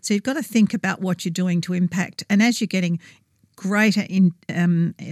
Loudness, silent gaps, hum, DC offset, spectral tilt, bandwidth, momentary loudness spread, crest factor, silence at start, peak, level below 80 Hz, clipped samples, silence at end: -21 LUFS; none; none; under 0.1%; -5.5 dB/octave; 14.5 kHz; 6 LU; 14 dB; 0.05 s; -8 dBFS; -70 dBFS; under 0.1%; 0 s